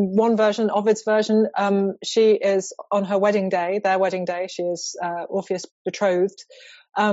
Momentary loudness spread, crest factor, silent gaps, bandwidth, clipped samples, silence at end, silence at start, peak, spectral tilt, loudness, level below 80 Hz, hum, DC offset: 9 LU; 14 dB; 5.71-5.85 s; 8 kHz; under 0.1%; 0 s; 0 s; -8 dBFS; -4.5 dB/octave; -22 LUFS; -72 dBFS; none; under 0.1%